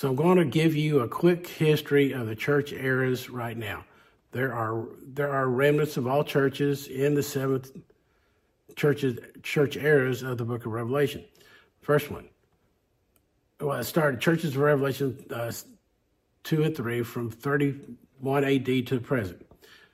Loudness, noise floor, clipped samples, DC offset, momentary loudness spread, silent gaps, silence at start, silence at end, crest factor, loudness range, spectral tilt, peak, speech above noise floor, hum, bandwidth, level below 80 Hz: -27 LUFS; -71 dBFS; under 0.1%; under 0.1%; 12 LU; none; 0 s; 0.55 s; 18 dB; 4 LU; -6.5 dB/octave; -8 dBFS; 45 dB; none; 16 kHz; -66 dBFS